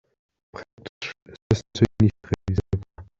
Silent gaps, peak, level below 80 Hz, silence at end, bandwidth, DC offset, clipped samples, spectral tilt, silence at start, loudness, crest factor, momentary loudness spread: 0.73-0.78 s, 0.89-1.01 s, 1.22-1.26 s, 1.42-1.50 s; -4 dBFS; -44 dBFS; 0.15 s; 7.6 kHz; under 0.1%; under 0.1%; -7 dB/octave; 0.55 s; -25 LUFS; 22 dB; 22 LU